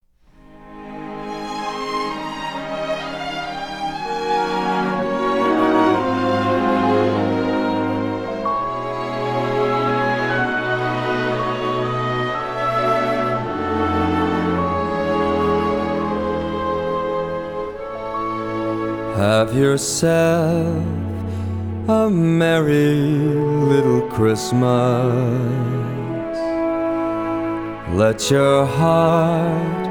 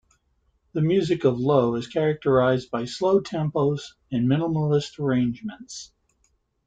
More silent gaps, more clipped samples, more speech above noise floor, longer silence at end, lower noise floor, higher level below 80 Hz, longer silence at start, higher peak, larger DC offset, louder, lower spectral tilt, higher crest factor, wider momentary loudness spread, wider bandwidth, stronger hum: neither; neither; second, 33 dB vs 46 dB; second, 0 s vs 0.8 s; second, -49 dBFS vs -69 dBFS; first, -44 dBFS vs -58 dBFS; second, 0.5 s vs 0.75 s; about the same, -4 dBFS vs -6 dBFS; first, 0.2% vs under 0.1%; first, -19 LUFS vs -23 LUFS; about the same, -6 dB/octave vs -7 dB/octave; about the same, 16 dB vs 18 dB; about the same, 10 LU vs 12 LU; first, 18.5 kHz vs 9.2 kHz; neither